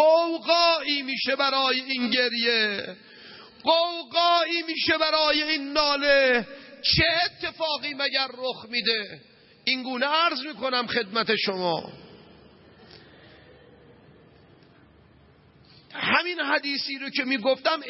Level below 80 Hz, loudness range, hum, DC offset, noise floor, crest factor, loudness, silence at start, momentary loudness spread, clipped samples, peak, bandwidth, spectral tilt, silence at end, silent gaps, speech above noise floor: -56 dBFS; 8 LU; none; under 0.1%; -56 dBFS; 20 dB; -23 LUFS; 0 s; 10 LU; under 0.1%; -6 dBFS; 6 kHz; -5.5 dB/octave; 0 s; none; 31 dB